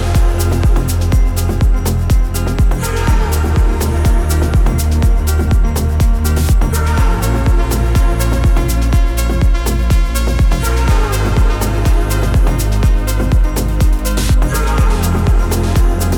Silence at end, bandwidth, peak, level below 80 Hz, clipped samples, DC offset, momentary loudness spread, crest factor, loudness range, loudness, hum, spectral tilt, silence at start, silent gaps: 0 s; 18 kHz; -2 dBFS; -12 dBFS; under 0.1%; under 0.1%; 1 LU; 10 dB; 1 LU; -14 LUFS; none; -6 dB/octave; 0 s; none